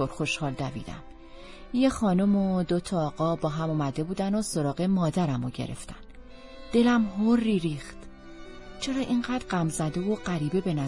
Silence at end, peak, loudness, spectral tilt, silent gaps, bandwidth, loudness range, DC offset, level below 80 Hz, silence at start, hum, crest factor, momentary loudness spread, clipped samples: 0 s; -10 dBFS; -27 LUFS; -6 dB/octave; none; 11.5 kHz; 2 LU; under 0.1%; -48 dBFS; 0 s; none; 16 dB; 22 LU; under 0.1%